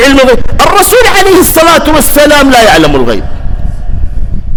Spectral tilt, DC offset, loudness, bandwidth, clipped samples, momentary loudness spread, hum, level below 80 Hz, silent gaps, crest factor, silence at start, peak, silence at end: -3.5 dB/octave; under 0.1%; -4 LUFS; over 20 kHz; 10%; 15 LU; none; -14 dBFS; none; 4 dB; 0 s; 0 dBFS; 0 s